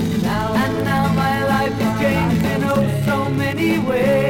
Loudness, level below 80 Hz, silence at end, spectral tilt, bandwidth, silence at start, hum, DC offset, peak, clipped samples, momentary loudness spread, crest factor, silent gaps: -18 LUFS; -40 dBFS; 0 s; -6.5 dB/octave; 17 kHz; 0 s; none; under 0.1%; -4 dBFS; under 0.1%; 2 LU; 12 dB; none